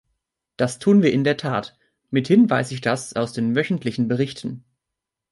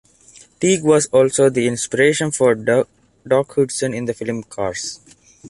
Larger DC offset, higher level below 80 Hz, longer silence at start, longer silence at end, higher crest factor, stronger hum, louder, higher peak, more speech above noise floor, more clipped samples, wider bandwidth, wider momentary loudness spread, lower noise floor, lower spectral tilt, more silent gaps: neither; about the same, -60 dBFS vs -56 dBFS; about the same, 0.6 s vs 0.6 s; first, 0.7 s vs 0 s; about the same, 16 dB vs 16 dB; neither; second, -21 LUFS vs -18 LUFS; about the same, -4 dBFS vs -2 dBFS; first, 64 dB vs 31 dB; neither; about the same, 11.5 kHz vs 11.5 kHz; about the same, 11 LU vs 11 LU; first, -84 dBFS vs -48 dBFS; first, -6.5 dB/octave vs -4.5 dB/octave; neither